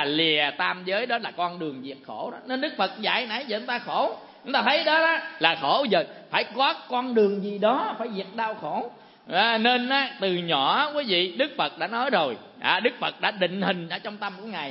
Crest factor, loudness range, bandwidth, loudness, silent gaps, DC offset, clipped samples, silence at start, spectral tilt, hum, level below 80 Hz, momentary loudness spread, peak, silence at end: 22 dB; 4 LU; 5.8 kHz; -25 LUFS; none; under 0.1%; under 0.1%; 0 s; -8.5 dB/octave; none; -82 dBFS; 11 LU; -2 dBFS; 0 s